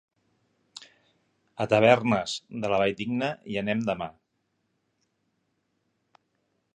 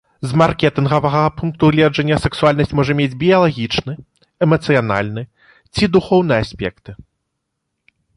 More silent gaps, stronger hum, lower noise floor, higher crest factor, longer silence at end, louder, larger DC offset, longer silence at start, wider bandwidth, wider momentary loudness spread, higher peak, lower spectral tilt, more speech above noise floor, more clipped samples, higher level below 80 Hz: neither; neither; about the same, -76 dBFS vs -74 dBFS; first, 26 dB vs 16 dB; first, 2.65 s vs 1.15 s; second, -26 LUFS vs -16 LUFS; neither; first, 0.8 s vs 0.2 s; second, 9.8 kHz vs 11.5 kHz; first, 26 LU vs 12 LU; about the same, -4 dBFS vs -2 dBFS; second, -5.5 dB/octave vs -7 dB/octave; second, 51 dB vs 59 dB; neither; second, -64 dBFS vs -40 dBFS